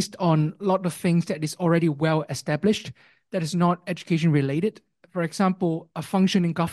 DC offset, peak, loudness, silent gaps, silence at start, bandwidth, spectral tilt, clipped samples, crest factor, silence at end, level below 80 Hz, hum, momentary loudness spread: under 0.1%; -8 dBFS; -24 LUFS; none; 0 s; 12.5 kHz; -6.5 dB/octave; under 0.1%; 16 dB; 0 s; -64 dBFS; none; 8 LU